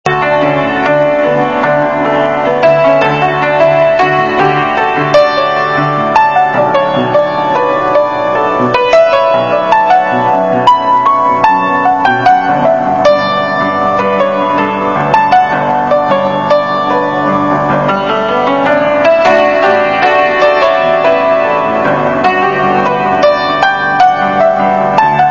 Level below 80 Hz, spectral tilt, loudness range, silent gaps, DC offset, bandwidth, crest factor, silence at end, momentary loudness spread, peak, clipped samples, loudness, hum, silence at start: -46 dBFS; -6 dB/octave; 2 LU; none; 0.6%; 7.4 kHz; 10 dB; 0 s; 3 LU; 0 dBFS; 0.2%; -10 LUFS; none; 0.05 s